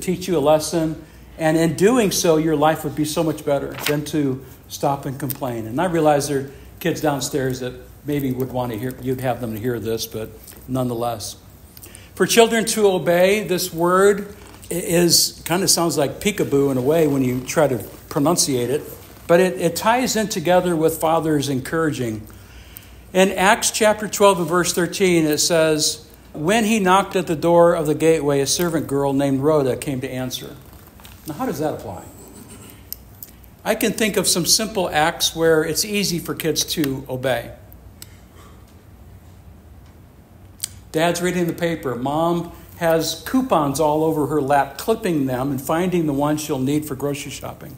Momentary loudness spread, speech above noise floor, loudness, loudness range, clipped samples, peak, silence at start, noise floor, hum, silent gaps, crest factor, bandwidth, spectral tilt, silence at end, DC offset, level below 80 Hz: 15 LU; 26 dB; -19 LUFS; 8 LU; under 0.1%; 0 dBFS; 0 s; -45 dBFS; none; none; 20 dB; 16 kHz; -4 dB/octave; 0 s; under 0.1%; -48 dBFS